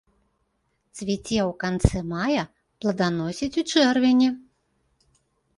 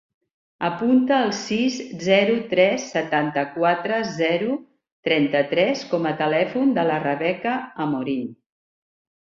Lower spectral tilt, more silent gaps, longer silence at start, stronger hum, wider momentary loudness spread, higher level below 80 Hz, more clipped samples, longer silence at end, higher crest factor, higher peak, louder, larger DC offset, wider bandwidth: about the same, -5.5 dB/octave vs -5 dB/octave; second, none vs 4.92-5.03 s; first, 0.95 s vs 0.6 s; neither; first, 12 LU vs 8 LU; first, -40 dBFS vs -66 dBFS; neither; first, 1.2 s vs 0.85 s; about the same, 22 dB vs 18 dB; about the same, -2 dBFS vs -4 dBFS; about the same, -24 LUFS vs -22 LUFS; neither; first, 11.5 kHz vs 7.4 kHz